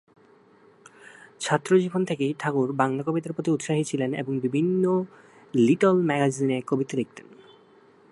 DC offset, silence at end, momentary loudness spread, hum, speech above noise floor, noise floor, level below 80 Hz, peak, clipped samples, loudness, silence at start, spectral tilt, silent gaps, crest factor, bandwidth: under 0.1%; 0.9 s; 8 LU; none; 32 dB; -56 dBFS; -72 dBFS; -6 dBFS; under 0.1%; -25 LUFS; 1.05 s; -6.5 dB/octave; none; 20 dB; 11.5 kHz